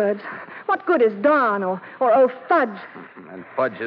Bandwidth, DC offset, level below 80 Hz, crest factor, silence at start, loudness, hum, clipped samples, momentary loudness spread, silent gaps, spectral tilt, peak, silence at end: 5.4 kHz; under 0.1%; -76 dBFS; 14 dB; 0 s; -20 LUFS; none; under 0.1%; 21 LU; none; -8.5 dB/octave; -6 dBFS; 0 s